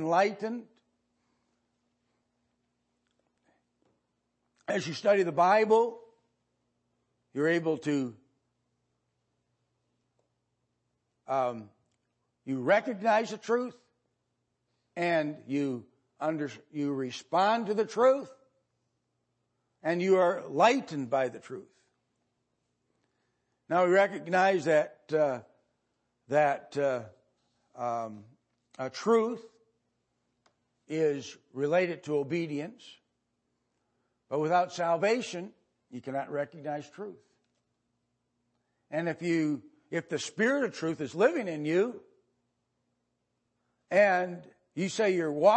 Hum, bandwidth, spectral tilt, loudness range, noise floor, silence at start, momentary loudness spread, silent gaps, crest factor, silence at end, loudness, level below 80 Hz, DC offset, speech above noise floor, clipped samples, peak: 60 Hz at -70 dBFS; 8.8 kHz; -5.5 dB/octave; 8 LU; -80 dBFS; 0 s; 16 LU; none; 22 dB; 0 s; -29 LUFS; -84 dBFS; under 0.1%; 52 dB; under 0.1%; -10 dBFS